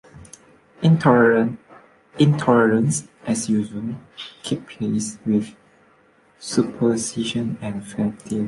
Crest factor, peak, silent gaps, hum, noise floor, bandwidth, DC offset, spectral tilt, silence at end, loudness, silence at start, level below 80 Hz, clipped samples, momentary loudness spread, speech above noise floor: 18 dB; -4 dBFS; none; none; -56 dBFS; 11.5 kHz; under 0.1%; -6 dB/octave; 0 s; -21 LUFS; 0.15 s; -58 dBFS; under 0.1%; 15 LU; 36 dB